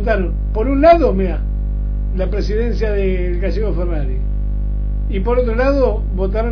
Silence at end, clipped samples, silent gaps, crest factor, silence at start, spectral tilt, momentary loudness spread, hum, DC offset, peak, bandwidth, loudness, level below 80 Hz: 0 s; under 0.1%; none; 16 dB; 0 s; -9 dB/octave; 9 LU; 50 Hz at -20 dBFS; under 0.1%; 0 dBFS; 5.4 kHz; -18 LUFS; -18 dBFS